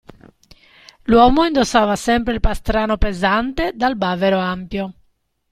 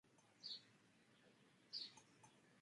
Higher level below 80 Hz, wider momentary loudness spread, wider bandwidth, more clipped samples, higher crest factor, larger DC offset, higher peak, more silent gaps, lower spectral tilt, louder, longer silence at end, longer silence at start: first, -28 dBFS vs under -90 dBFS; about the same, 12 LU vs 14 LU; first, 14.5 kHz vs 11 kHz; neither; second, 18 dB vs 24 dB; neither; first, 0 dBFS vs -36 dBFS; neither; first, -5 dB/octave vs -1.5 dB/octave; first, -17 LUFS vs -54 LUFS; first, 0.6 s vs 0 s; first, 1.1 s vs 0.05 s